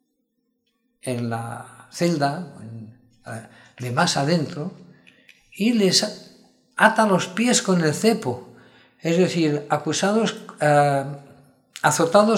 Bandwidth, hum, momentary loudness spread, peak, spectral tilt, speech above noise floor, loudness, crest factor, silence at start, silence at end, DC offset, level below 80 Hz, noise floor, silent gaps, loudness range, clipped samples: 16.5 kHz; none; 20 LU; 0 dBFS; -4.5 dB/octave; 52 dB; -21 LUFS; 22 dB; 1.05 s; 0 s; under 0.1%; -70 dBFS; -73 dBFS; none; 8 LU; under 0.1%